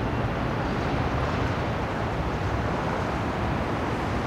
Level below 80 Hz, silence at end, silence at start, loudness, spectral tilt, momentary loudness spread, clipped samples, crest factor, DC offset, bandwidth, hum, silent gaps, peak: -36 dBFS; 0 s; 0 s; -27 LUFS; -7 dB/octave; 2 LU; under 0.1%; 14 dB; under 0.1%; 14 kHz; none; none; -14 dBFS